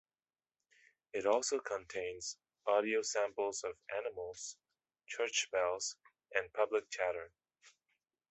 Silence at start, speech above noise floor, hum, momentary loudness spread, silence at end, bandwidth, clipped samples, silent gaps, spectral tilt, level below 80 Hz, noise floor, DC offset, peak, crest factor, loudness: 1.15 s; over 53 dB; none; 12 LU; 0.6 s; 8.4 kHz; under 0.1%; none; -1 dB/octave; -78 dBFS; under -90 dBFS; under 0.1%; -16 dBFS; 22 dB; -38 LUFS